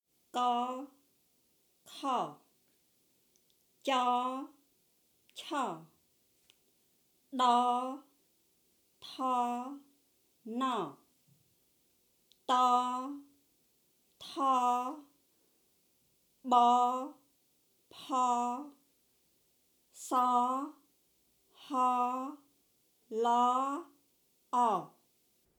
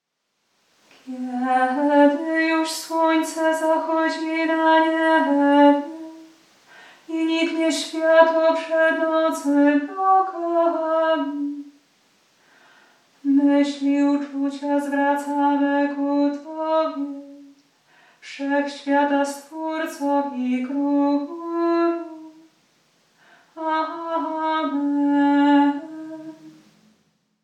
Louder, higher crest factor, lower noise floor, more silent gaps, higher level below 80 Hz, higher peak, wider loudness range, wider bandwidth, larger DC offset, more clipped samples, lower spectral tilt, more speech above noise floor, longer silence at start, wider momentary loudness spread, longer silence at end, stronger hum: second, -32 LUFS vs -21 LUFS; about the same, 22 dB vs 20 dB; about the same, -73 dBFS vs -73 dBFS; neither; about the same, under -90 dBFS vs -88 dBFS; second, -14 dBFS vs -2 dBFS; about the same, 6 LU vs 6 LU; first, over 20 kHz vs 13.5 kHz; neither; neither; about the same, -3.5 dB/octave vs -3 dB/octave; second, 42 dB vs 52 dB; second, 0.35 s vs 1.05 s; first, 21 LU vs 14 LU; second, 0.7 s vs 0.95 s; neither